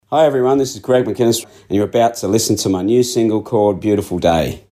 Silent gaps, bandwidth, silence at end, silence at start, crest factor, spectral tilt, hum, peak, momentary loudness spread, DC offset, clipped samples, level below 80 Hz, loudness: none; 15.5 kHz; 0.15 s; 0.1 s; 14 dB; -5 dB/octave; none; -2 dBFS; 4 LU; under 0.1%; under 0.1%; -44 dBFS; -16 LUFS